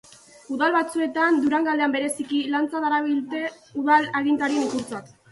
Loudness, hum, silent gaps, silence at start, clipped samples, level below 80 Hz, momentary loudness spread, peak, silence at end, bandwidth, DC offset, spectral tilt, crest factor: -23 LUFS; none; none; 0.5 s; under 0.1%; -68 dBFS; 10 LU; -6 dBFS; 0.25 s; 12 kHz; under 0.1%; -3.5 dB/octave; 16 dB